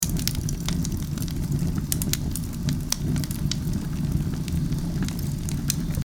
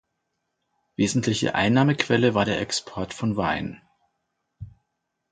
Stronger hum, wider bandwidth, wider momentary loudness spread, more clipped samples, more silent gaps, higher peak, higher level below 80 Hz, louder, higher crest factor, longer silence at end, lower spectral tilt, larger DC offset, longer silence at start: neither; first, 19.5 kHz vs 9.6 kHz; second, 3 LU vs 10 LU; neither; neither; first, 0 dBFS vs -4 dBFS; first, -34 dBFS vs -52 dBFS; second, -27 LUFS vs -23 LUFS; about the same, 26 dB vs 22 dB; second, 0 s vs 0.6 s; about the same, -4.5 dB/octave vs -5 dB/octave; neither; second, 0 s vs 1 s